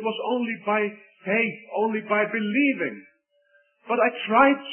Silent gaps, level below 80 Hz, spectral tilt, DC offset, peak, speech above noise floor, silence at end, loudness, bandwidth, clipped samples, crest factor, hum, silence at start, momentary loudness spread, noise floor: none; -74 dBFS; -9.5 dB/octave; under 0.1%; -4 dBFS; 40 dB; 0 s; -24 LUFS; 3.4 kHz; under 0.1%; 20 dB; none; 0 s; 11 LU; -64 dBFS